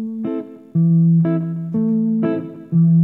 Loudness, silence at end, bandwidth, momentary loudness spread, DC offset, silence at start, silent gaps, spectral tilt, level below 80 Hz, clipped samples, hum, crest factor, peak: -18 LUFS; 0 s; 2.8 kHz; 11 LU; under 0.1%; 0 s; none; -13 dB/octave; -64 dBFS; under 0.1%; none; 8 dB; -8 dBFS